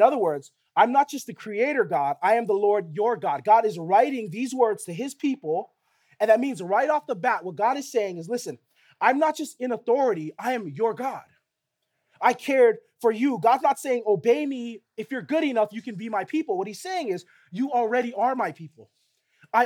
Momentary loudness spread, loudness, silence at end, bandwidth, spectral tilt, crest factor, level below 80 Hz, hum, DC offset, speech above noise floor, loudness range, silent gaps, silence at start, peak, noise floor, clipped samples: 11 LU; -24 LUFS; 0 s; 17 kHz; -5 dB/octave; 20 dB; -86 dBFS; none; under 0.1%; 57 dB; 5 LU; none; 0 s; -4 dBFS; -80 dBFS; under 0.1%